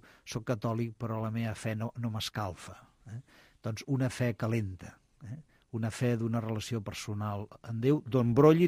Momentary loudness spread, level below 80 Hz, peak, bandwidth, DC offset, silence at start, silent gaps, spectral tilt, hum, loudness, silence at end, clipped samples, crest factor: 19 LU; -62 dBFS; -10 dBFS; 15.5 kHz; under 0.1%; 0.25 s; none; -7 dB/octave; none; -33 LUFS; 0 s; under 0.1%; 20 dB